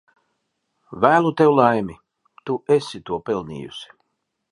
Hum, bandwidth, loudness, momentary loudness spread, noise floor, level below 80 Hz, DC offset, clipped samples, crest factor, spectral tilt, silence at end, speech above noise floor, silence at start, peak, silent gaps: none; 11 kHz; -19 LUFS; 20 LU; -76 dBFS; -58 dBFS; under 0.1%; under 0.1%; 20 dB; -6.5 dB/octave; 0.65 s; 56 dB; 0.9 s; 0 dBFS; none